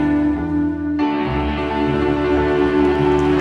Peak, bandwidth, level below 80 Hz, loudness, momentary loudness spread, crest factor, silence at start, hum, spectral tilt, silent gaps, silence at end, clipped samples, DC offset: -4 dBFS; 7.4 kHz; -32 dBFS; -18 LUFS; 5 LU; 12 dB; 0 s; none; -8 dB/octave; none; 0 s; under 0.1%; under 0.1%